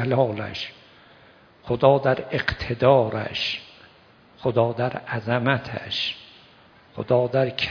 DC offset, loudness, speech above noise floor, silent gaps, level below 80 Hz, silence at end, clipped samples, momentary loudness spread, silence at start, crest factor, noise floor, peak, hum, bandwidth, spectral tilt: under 0.1%; -23 LUFS; 31 dB; none; -52 dBFS; 0 s; under 0.1%; 13 LU; 0 s; 22 dB; -53 dBFS; -2 dBFS; none; 5.4 kHz; -7 dB/octave